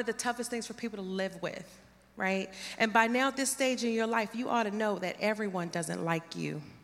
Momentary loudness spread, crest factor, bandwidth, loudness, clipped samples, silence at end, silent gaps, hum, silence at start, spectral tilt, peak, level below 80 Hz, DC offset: 11 LU; 24 dB; 16 kHz; -32 LUFS; under 0.1%; 0.05 s; none; none; 0 s; -4 dB/octave; -10 dBFS; -72 dBFS; under 0.1%